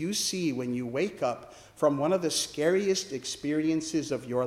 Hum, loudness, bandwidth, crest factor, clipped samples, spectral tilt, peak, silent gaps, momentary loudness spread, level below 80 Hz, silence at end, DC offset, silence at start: none; -29 LUFS; 16 kHz; 18 dB; under 0.1%; -4 dB/octave; -12 dBFS; none; 6 LU; -66 dBFS; 0 s; under 0.1%; 0 s